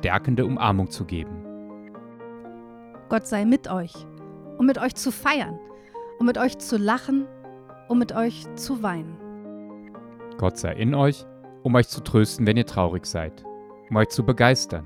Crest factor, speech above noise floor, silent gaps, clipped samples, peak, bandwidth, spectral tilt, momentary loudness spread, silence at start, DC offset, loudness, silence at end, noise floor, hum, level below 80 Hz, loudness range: 20 dB; 22 dB; none; under 0.1%; -4 dBFS; 16 kHz; -6 dB/octave; 21 LU; 0 s; under 0.1%; -23 LUFS; 0 s; -44 dBFS; none; -48 dBFS; 5 LU